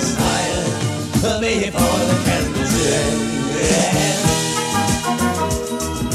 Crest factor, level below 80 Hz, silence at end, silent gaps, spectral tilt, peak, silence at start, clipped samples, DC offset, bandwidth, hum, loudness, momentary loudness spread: 16 dB; -34 dBFS; 0 s; none; -4 dB/octave; -4 dBFS; 0 s; under 0.1%; under 0.1%; 16 kHz; none; -18 LUFS; 5 LU